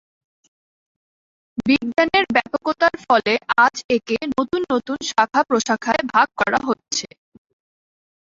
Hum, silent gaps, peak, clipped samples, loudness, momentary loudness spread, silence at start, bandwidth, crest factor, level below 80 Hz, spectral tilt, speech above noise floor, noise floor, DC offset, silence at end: none; 3.84-3.89 s; -2 dBFS; under 0.1%; -19 LUFS; 7 LU; 1.55 s; 7.8 kHz; 18 dB; -56 dBFS; -3 dB/octave; over 71 dB; under -90 dBFS; under 0.1%; 1.3 s